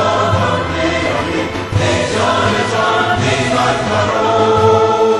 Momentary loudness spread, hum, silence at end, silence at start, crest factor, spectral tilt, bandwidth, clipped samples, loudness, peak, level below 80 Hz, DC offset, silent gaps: 5 LU; none; 0 s; 0 s; 12 dB; -5 dB/octave; 12 kHz; under 0.1%; -14 LUFS; 0 dBFS; -36 dBFS; under 0.1%; none